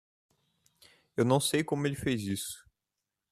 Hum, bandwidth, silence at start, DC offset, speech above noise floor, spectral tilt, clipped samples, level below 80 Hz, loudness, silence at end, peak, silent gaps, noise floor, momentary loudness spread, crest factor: none; 14.5 kHz; 1.15 s; under 0.1%; 58 dB; -5 dB/octave; under 0.1%; -64 dBFS; -31 LUFS; 0.7 s; -12 dBFS; none; -88 dBFS; 13 LU; 22 dB